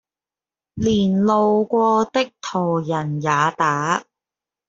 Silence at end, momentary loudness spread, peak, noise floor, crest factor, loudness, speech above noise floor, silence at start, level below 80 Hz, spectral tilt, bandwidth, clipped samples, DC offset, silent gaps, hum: 0.65 s; 7 LU; -4 dBFS; under -90 dBFS; 16 dB; -19 LUFS; over 71 dB; 0.75 s; -52 dBFS; -6 dB/octave; 7.8 kHz; under 0.1%; under 0.1%; none; none